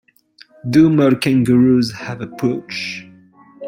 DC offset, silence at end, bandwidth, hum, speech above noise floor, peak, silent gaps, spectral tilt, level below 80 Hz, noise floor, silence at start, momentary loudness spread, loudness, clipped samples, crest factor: under 0.1%; 0 s; 16 kHz; none; 34 dB; -2 dBFS; none; -7 dB/octave; -52 dBFS; -49 dBFS; 0.65 s; 15 LU; -15 LUFS; under 0.1%; 14 dB